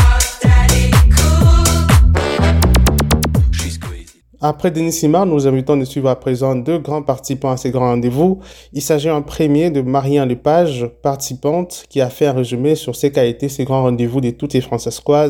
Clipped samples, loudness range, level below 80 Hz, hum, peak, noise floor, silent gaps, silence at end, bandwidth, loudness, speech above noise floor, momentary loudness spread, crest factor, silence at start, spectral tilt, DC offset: under 0.1%; 5 LU; -20 dBFS; none; 0 dBFS; -35 dBFS; none; 0 s; 18.5 kHz; -15 LUFS; 19 dB; 9 LU; 14 dB; 0 s; -5.5 dB/octave; under 0.1%